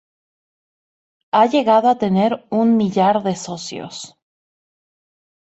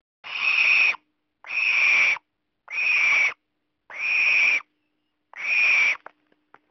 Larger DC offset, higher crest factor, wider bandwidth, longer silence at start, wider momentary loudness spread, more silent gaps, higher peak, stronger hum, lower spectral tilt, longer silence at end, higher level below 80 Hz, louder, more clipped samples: neither; about the same, 18 dB vs 14 dB; first, 8.2 kHz vs 6.4 kHz; first, 1.35 s vs 0.25 s; about the same, 16 LU vs 14 LU; neither; first, -2 dBFS vs -10 dBFS; neither; first, -6 dB/octave vs 4.5 dB/octave; first, 1.5 s vs 0.75 s; first, -64 dBFS vs -74 dBFS; about the same, -17 LUFS vs -19 LUFS; neither